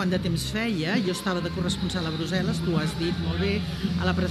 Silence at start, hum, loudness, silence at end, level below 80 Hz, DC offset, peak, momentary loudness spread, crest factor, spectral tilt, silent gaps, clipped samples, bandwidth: 0 s; none; -27 LUFS; 0 s; -42 dBFS; under 0.1%; -12 dBFS; 3 LU; 14 dB; -5.5 dB/octave; none; under 0.1%; 13 kHz